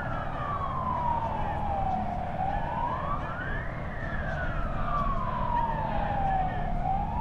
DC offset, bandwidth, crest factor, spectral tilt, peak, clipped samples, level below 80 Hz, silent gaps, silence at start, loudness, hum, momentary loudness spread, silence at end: under 0.1%; 6.4 kHz; 12 dB; -8 dB/octave; -16 dBFS; under 0.1%; -36 dBFS; none; 0 s; -31 LUFS; none; 5 LU; 0 s